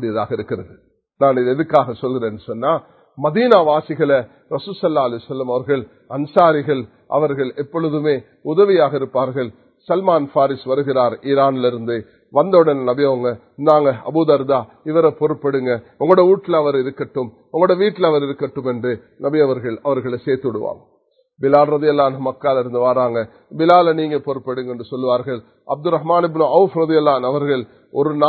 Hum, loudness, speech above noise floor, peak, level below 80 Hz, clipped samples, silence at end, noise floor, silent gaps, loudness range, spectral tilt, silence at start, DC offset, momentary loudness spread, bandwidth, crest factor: none; -17 LUFS; 40 dB; 0 dBFS; -60 dBFS; under 0.1%; 0 s; -57 dBFS; none; 3 LU; -9.5 dB/octave; 0 s; under 0.1%; 11 LU; 4.6 kHz; 16 dB